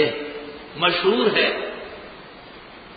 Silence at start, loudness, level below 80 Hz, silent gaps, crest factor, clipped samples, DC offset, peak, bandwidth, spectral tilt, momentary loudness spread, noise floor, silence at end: 0 s; -20 LUFS; -56 dBFS; none; 18 dB; under 0.1%; under 0.1%; -6 dBFS; 5 kHz; -9 dB/octave; 23 LU; -42 dBFS; 0 s